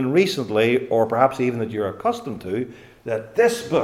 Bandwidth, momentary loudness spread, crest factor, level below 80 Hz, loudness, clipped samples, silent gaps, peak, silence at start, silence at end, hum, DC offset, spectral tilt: 16 kHz; 10 LU; 18 dB; -60 dBFS; -21 LUFS; under 0.1%; none; -2 dBFS; 0 s; 0 s; none; under 0.1%; -5.5 dB/octave